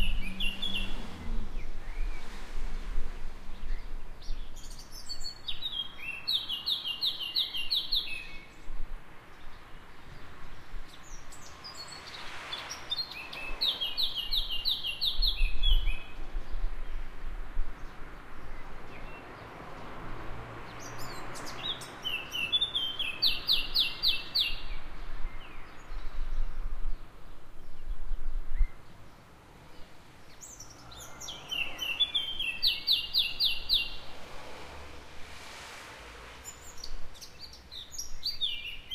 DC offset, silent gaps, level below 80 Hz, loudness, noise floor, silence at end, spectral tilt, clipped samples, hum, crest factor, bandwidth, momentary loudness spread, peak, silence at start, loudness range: under 0.1%; none; -36 dBFS; -32 LUFS; -53 dBFS; 0 s; -2 dB/octave; under 0.1%; none; 18 dB; 15 kHz; 21 LU; -12 dBFS; 0 s; 17 LU